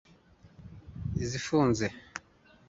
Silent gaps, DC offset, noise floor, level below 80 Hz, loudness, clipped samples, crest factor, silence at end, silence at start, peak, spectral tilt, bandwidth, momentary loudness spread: none; under 0.1%; -60 dBFS; -50 dBFS; -30 LUFS; under 0.1%; 20 dB; 0.5 s; 0.45 s; -12 dBFS; -5.5 dB/octave; 8 kHz; 22 LU